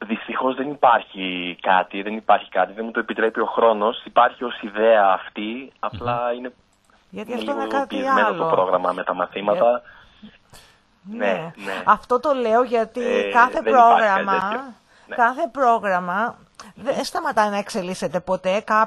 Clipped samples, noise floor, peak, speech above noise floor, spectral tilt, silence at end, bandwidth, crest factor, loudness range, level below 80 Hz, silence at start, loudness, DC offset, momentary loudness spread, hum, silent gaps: under 0.1%; -57 dBFS; 0 dBFS; 37 dB; -5 dB/octave; 0 s; 12.5 kHz; 20 dB; 5 LU; -58 dBFS; 0 s; -20 LUFS; under 0.1%; 12 LU; none; none